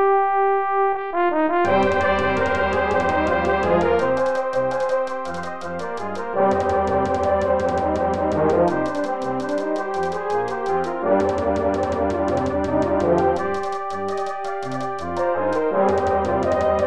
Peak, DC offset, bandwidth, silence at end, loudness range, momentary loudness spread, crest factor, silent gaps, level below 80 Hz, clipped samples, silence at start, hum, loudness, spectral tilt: -6 dBFS; 1%; 11 kHz; 0 s; 3 LU; 8 LU; 14 dB; none; -42 dBFS; under 0.1%; 0 s; none; -21 LUFS; -6.5 dB/octave